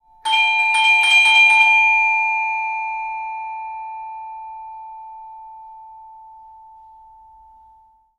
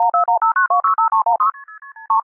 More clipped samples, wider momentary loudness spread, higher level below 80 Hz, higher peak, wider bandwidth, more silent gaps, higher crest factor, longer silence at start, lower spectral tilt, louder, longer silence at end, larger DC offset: neither; first, 25 LU vs 5 LU; first, -62 dBFS vs -80 dBFS; first, -2 dBFS vs -6 dBFS; first, 14.5 kHz vs 2.5 kHz; neither; first, 16 dB vs 10 dB; first, 0.25 s vs 0 s; second, 3.5 dB/octave vs -4.5 dB/octave; first, -13 LUFS vs -16 LUFS; first, 1.95 s vs 0.05 s; neither